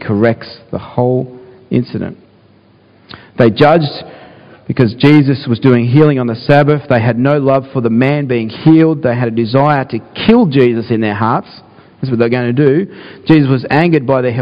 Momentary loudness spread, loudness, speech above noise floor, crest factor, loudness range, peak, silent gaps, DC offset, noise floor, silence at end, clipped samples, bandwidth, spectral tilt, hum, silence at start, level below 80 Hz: 13 LU; -12 LUFS; 35 dB; 12 dB; 5 LU; 0 dBFS; none; under 0.1%; -46 dBFS; 0 s; 0.6%; 5.4 kHz; -9.5 dB/octave; none; 0 s; -46 dBFS